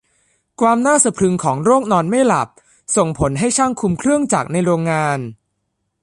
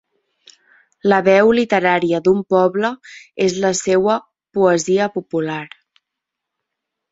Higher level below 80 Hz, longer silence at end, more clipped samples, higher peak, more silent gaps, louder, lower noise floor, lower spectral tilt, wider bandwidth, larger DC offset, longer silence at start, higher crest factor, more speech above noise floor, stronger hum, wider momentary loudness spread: first, -46 dBFS vs -58 dBFS; second, 0.7 s vs 1.45 s; neither; about the same, 0 dBFS vs -2 dBFS; neither; about the same, -16 LUFS vs -17 LUFS; second, -72 dBFS vs -81 dBFS; about the same, -5 dB/octave vs -5 dB/octave; first, 11.5 kHz vs 8 kHz; neither; second, 0.6 s vs 1.05 s; about the same, 16 dB vs 16 dB; second, 56 dB vs 65 dB; neither; second, 6 LU vs 12 LU